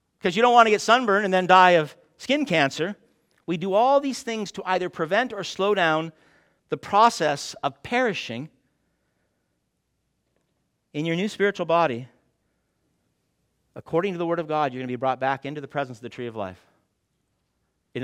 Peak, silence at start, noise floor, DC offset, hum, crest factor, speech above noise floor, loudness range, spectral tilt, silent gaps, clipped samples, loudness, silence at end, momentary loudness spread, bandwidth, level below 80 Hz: -2 dBFS; 0.25 s; -75 dBFS; under 0.1%; none; 24 dB; 52 dB; 10 LU; -4.5 dB/octave; none; under 0.1%; -22 LUFS; 0 s; 17 LU; 15.5 kHz; -68 dBFS